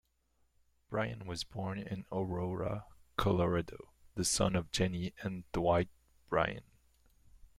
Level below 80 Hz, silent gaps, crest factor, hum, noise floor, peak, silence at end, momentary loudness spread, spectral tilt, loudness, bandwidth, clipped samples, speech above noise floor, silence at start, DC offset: -54 dBFS; none; 22 dB; none; -75 dBFS; -16 dBFS; 0.1 s; 11 LU; -4.5 dB/octave; -36 LUFS; 15.5 kHz; under 0.1%; 40 dB; 0.9 s; under 0.1%